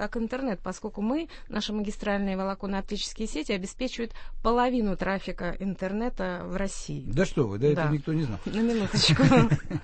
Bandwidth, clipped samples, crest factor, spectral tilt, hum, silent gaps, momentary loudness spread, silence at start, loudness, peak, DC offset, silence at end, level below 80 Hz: 8.8 kHz; under 0.1%; 20 dB; -5.5 dB/octave; none; none; 11 LU; 0 s; -28 LUFS; -6 dBFS; under 0.1%; 0 s; -40 dBFS